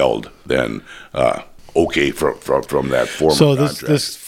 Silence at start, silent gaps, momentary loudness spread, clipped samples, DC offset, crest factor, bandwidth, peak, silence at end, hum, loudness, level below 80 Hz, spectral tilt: 0 s; none; 11 LU; under 0.1%; under 0.1%; 18 dB; 16.5 kHz; 0 dBFS; 0 s; none; -18 LUFS; -42 dBFS; -5 dB/octave